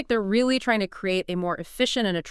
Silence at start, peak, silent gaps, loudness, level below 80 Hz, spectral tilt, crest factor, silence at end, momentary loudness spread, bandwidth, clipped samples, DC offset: 0 s; -8 dBFS; none; -24 LUFS; -52 dBFS; -4.5 dB/octave; 16 dB; 0 s; 6 LU; 12 kHz; under 0.1%; under 0.1%